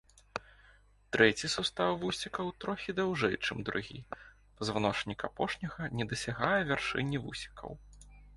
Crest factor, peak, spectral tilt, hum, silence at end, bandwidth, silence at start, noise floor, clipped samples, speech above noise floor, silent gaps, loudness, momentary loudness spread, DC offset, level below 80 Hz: 26 dB; -10 dBFS; -4.5 dB/octave; 50 Hz at -60 dBFS; 0 s; 11.5 kHz; 0.35 s; -62 dBFS; under 0.1%; 29 dB; none; -33 LUFS; 16 LU; under 0.1%; -58 dBFS